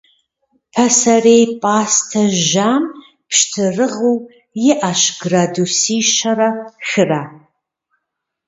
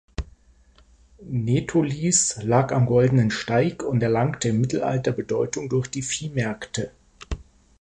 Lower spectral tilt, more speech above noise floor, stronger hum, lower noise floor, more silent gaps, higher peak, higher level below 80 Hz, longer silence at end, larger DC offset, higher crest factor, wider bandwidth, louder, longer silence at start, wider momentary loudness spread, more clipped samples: second, -3 dB/octave vs -5 dB/octave; first, 62 dB vs 33 dB; neither; first, -76 dBFS vs -55 dBFS; neither; first, 0 dBFS vs -6 dBFS; second, -60 dBFS vs -44 dBFS; first, 1.1 s vs 0.4 s; neither; about the same, 16 dB vs 18 dB; second, 8 kHz vs 11 kHz; first, -14 LUFS vs -23 LUFS; first, 0.75 s vs 0.2 s; second, 9 LU vs 17 LU; neither